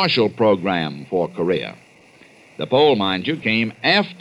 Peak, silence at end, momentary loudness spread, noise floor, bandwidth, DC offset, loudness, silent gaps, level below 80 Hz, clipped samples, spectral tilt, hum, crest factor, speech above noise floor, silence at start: -4 dBFS; 0.05 s; 8 LU; -49 dBFS; 11 kHz; under 0.1%; -19 LUFS; none; -62 dBFS; under 0.1%; -6.5 dB/octave; none; 16 dB; 30 dB; 0 s